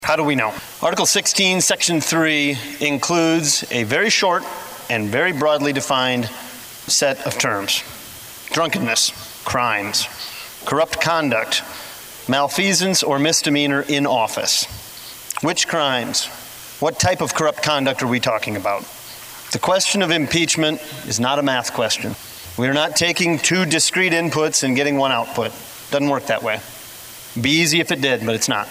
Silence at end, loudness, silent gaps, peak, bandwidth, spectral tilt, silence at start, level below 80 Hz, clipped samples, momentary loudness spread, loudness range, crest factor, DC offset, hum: 0 s; -18 LUFS; none; -2 dBFS; 16 kHz; -2.5 dB/octave; 0 s; -56 dBFS; under 0.1%; 15 LU; 3 LU; 18 dB; under 0.1%; none